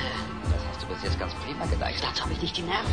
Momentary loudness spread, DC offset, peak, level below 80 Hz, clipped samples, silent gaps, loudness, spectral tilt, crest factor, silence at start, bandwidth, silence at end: 5 LU; 0.3%; -14 dBFS; -36 dBFS; under 0.1%; none; -30 LUFS; -5 dB/octave; 16 dB; 0 s; 10 kHz; 0 s